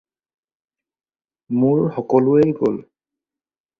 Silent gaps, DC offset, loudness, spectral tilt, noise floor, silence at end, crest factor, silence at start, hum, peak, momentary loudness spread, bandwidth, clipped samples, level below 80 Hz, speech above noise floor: none; under 0.1%; -18 LUFS; -10.5 dB/octave; under -90 dBFS; 0.95 s; 18 dB; 1.5 s; none; -2 dBFS; 9 LU; 6.6 kHz; under 0.1%; -60 dBFS; over 73 dB